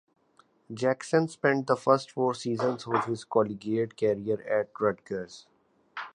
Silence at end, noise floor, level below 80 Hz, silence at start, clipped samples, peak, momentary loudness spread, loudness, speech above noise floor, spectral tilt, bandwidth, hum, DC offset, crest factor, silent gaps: 0.05 s; -64 dBFS; -70 dBFS; 0.7 s; under 0.1%; -8 dBFS; 12 LU; -28 LUFS; 37 dB; -6 dB/octave; 11 kHz; none; under 0.1%; 22 dB; none